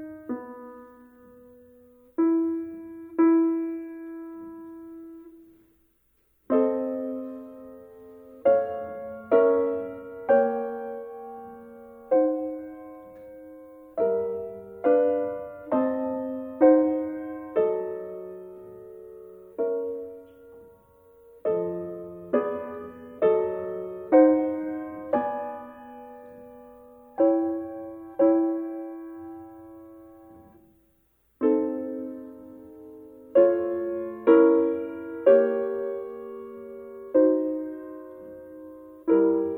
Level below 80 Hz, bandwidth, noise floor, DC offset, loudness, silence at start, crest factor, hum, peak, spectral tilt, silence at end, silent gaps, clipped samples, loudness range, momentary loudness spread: -68 dBFS; 3.5 kHz; -67 dBFS; under 0.1%; -25 LUFS; 0 s; 22 dB; none; -6 dBFS; -9.5 dB/octave; 0 s; none; under 0.1%; 9 LU; 24 LU